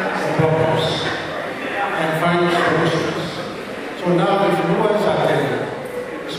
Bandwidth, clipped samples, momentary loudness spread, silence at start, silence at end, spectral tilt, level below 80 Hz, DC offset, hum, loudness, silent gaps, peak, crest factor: 15.5 kHz; under 0.1%; 11 LU; 0 s; 0 s; -6 dB/octave; -54 dBFS; under 0.1%; none; -19 LUFS; none; -4 dBFS; 14 dB